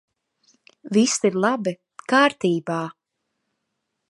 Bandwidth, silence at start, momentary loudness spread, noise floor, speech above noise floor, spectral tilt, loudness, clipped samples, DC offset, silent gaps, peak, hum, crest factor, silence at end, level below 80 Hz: 11.5 kHz; 0.85 s; 11 LU; -78 dBFS; 58 dB; -4 dB/octave; -21 LUFS; under 0.1%; under 0.1%; none; -4 dBFS; none; 20 dB; 1.2 s; -74 dBFS